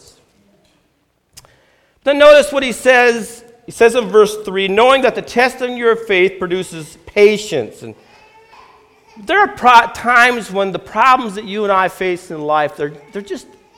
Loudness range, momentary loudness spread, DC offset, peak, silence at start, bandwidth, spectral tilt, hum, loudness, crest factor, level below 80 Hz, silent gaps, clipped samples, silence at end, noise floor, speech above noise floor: 5 LU; 17 LU; under 0.1%; 0 dBFS; 2.05 s; 16.5 kHz; -3.5 dB/octave; none; -13 LUFS; 14 dB; -50 dBFS; none; 0.2%; 0.35 s; -61 dBFS; 48 dB